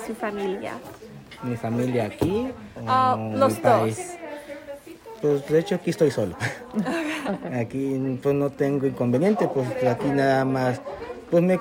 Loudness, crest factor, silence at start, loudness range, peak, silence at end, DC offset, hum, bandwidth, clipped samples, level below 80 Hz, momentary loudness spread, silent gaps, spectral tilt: -24 LUFS; 18 dB; 0 s; 3 LU; -6 dBFS; 0 s; under 0.1%; none; 16 kHz; under 0.1%; -58 dBFS; 16 LU; none; -6.5 dB/octave